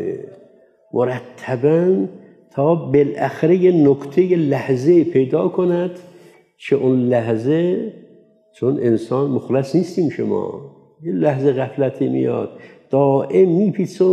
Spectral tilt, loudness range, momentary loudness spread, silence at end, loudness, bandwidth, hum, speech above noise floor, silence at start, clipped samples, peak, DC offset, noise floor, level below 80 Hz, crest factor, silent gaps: -9 dB/octave; 4 LU; 12 LU; 0 s; -18 LUFS; 9 kHz; none; 34 dB; 0 s; under 0.1%; -4 dBFS; under 0.1%; -50 dBFS; -66 dBFS; 14 dB; none